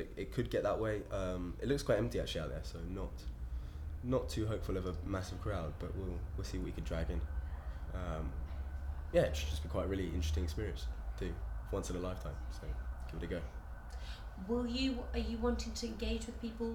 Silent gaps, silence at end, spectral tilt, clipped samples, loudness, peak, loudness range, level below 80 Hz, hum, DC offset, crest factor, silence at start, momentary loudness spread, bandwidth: none; 0 s; -6 dB/octave; under 0.1%; -40 LUFS; -18 dBFS; 4 LU; -42 dBFS; none; under 0.1%; 20 dB; 0 s; 10 LU; 18 kHz